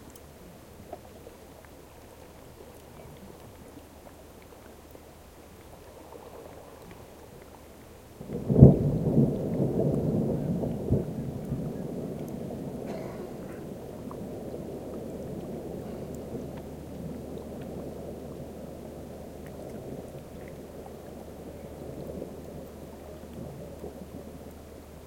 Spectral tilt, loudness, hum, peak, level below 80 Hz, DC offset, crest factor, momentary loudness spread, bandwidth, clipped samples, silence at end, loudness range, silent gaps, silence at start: -9 dB/octave; -31 LUFS; none; 0 dBFS; -48 dBFS; under 0.1%; 32 dB; 22 LU; 16.5 kHz; under 0.1%; 0 s; 24 LU; none; 0 s